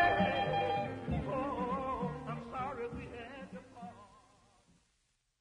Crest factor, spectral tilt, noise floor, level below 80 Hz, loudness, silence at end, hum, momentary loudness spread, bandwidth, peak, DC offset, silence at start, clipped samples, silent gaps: 20 dB; -7 dB/octave; -78 dBFS; -56 dBFS; -37 LUFS; 1.2 s; none; 18 LU; 10 kHz; -16 dBFS; under 0.1%; 0 s; under 0.1%; none